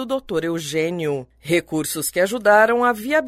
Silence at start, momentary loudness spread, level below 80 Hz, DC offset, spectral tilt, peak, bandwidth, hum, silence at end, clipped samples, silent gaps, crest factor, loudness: 0 s; 10 LU; -54 dBFS; under 0.1%; -4 dB/octave; -4 dBFS; 16 kHz; none; 0 s; under 0.1%; none; 16 dB; -20 LUFS